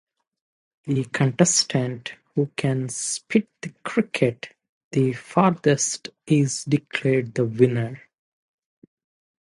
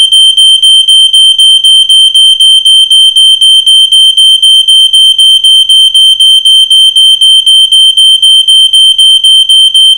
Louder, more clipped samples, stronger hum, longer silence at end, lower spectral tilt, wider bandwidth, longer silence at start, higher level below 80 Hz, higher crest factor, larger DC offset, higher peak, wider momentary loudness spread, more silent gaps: second, -23 LUFS vs 0 LUFS; second, under 0.1% vs 20%; neither; first, 1.45 s vs 0 s; first, -5 dB/octave vs 6 dB/octave; second, 11.5 kHz vs over 20 kHz; first, 0.85 s vs 0 s; second, -64 dBFS vs -52 dBFS; first, 22 dB vs 2 dB; neither; about the same, -2 dBFS vs 0 dBFS; first, 13 LU vs 1 LU; first, 4.69-4.91 s vs none